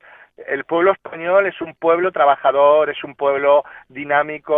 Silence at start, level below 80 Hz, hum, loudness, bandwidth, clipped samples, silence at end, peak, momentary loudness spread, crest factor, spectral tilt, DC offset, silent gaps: 0.4 s; -62 dBFS; none; -17 LUFS; 3.8 kHz; under 0.1%; 0 s; 0 dBFS; 12 LU; 16 dB; -8.5 dB/octave; under 0.1%; none